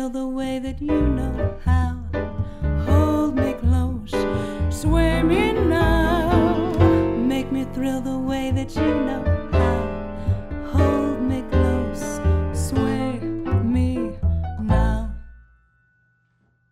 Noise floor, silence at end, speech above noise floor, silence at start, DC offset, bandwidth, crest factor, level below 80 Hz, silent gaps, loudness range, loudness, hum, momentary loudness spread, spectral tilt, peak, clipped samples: -64 dBFS; 1.35 s; 43 dB; 0 s; under 0.1%; 14 kHz; 16 dB; -28 dBFS; none; 4 LU; -22 LUFS; none; 8 LU; -7.5 dB/octave; -4 dBFS; under 0.1%